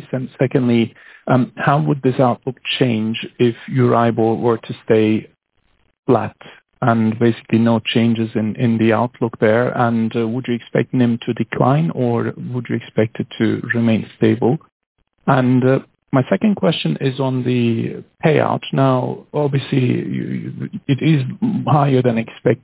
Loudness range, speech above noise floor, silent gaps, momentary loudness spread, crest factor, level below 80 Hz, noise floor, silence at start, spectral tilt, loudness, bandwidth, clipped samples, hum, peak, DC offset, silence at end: 2 LU; 46 dB; 5.99-6.03 s, 14.72-14.80 s, 14.86-14.95 s; 8 LU; 16 dB; -56 dBFS; -63 dBFS; 0 s; -11.5 dB/octave; -18 LUFS; 4 kHz; under 0.1%; none; -2 dBFS; under 0.1%; 0.05 s